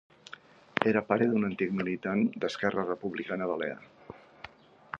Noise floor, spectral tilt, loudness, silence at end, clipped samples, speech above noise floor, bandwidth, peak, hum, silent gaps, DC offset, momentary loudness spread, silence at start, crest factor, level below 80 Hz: -52 dBFS; -7 dB/octave; -30 LUFS; 0.05 s; under 0.1%; 22 dB; 7.8 kHz; -6 dBFS; none; none; under 0.1%; 22 LU; 0.3 s; 26 dB; -68 dBFS